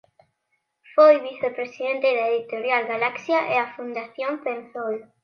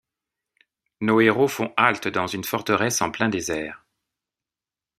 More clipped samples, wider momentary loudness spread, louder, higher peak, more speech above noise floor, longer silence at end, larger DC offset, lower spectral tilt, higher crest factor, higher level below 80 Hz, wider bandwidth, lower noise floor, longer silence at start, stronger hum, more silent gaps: neither; first, 14 LU vs 10 LU; about the same, -23 LUFS vs -22 LUFS; second, -4 dBFS vs 0 dBFS; second, 52 dB vs over 68 dB; second, 0.2 s vs 1.2 s; neither; about the same, -5 dB/octave vs -4 dB/octave; about the same, 20 dB vs 24 dB; second, -80 dBFS vs -62 dBFS; second, 6.6 kHz vs 15 kHz; second, -74 dBFS vs under -90 dBFS; about the same, 0.95 s vs 1 s; neither; neither